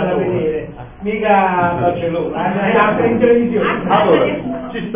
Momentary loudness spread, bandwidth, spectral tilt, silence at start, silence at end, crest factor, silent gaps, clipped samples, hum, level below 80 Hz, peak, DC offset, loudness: 11 LU; 3.7 kHz; -10.5 dB/octave; 0 s; 0 s; 14 dB; none; under 0.1%; none; -42 dBFS; -2 dBFS; under 0.1%; -15 LUFS